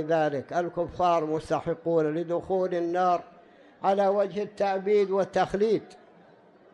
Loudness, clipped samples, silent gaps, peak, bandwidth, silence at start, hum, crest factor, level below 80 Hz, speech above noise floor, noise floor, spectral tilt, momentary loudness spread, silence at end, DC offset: -27 LUFS; under 0.1%; none; -12 dBFS; 10.5 kHz; 0 s; none; 14 dB; -60 dBFS; 30 dB; -56 dBFS; -6.5 dB/octave; 6 LU; 0.8 s; under 0.1%